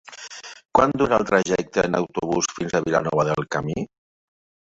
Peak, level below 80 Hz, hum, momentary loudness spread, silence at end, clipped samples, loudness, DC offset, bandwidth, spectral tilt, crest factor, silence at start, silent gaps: -2 dBFS; -52 dBFS; none; 17 LU; 0.9 s; under 0.1%; -22 LUFS; under 0.1%; 8 kHz; -5 dB/octave; 20 dB; 0.1 s; none